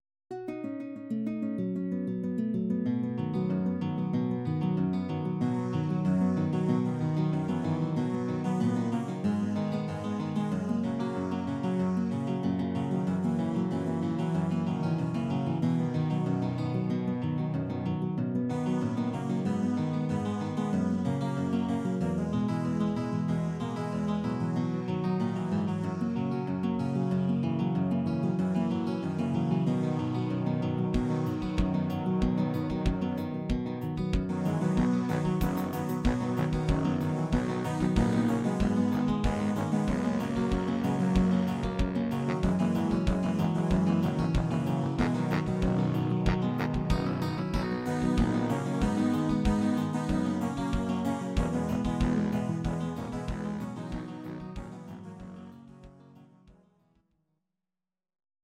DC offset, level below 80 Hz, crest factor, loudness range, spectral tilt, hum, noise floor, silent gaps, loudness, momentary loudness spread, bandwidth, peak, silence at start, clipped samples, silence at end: under 0.1%; -42 dBFS; 18 dB; 3 LU; -8 dB/octave; none; under -90 dBFS; none; -30 LUFS; 5 LU; 15.5 kHz; -10 dBFS; 0.3 s; under 0.1%; 1.9 s